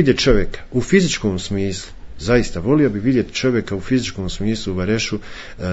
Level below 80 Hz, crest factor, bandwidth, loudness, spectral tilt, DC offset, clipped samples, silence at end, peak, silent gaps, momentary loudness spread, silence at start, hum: -32 dBFS; 16 dB; 8 kHz; -19 LUFS; -5.5 dB/octave; under 0.1%; under 0.1%; 0 s; -2 dBFS; none; 12 LU; 0 s; none